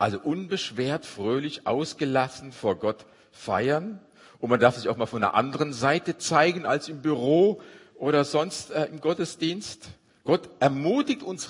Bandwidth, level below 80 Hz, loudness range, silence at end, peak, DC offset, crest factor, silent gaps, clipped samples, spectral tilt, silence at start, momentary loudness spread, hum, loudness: 11 kHz; -68 dBFS; 4 LU; 0 s; -4 dBFS; under 0.1%; 22 dB; none; under 0.1%; -5 dB/octave; 0 s; 10 LU; none; -26 LUFS